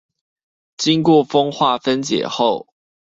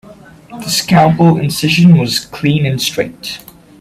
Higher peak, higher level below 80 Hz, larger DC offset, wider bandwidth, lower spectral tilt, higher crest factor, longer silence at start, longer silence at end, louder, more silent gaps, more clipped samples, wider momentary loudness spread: about the same, -2 dBFS vs 0 dBFS; second, -60 dBFS vs -46 dBFS; neither; second, 7.8 kHz vs 15.5 kHz; about the same, -5 dB/octave vs -5.5 dB/octave; about the same, 16 dB vs 12 dB; first, 0.8 s vs 0.1 s; about the same, 0.5 s vs 0.45 s; second, -17 LUFS vs -12 LUFS; neither; neither; second, 7 LU vs 17 LU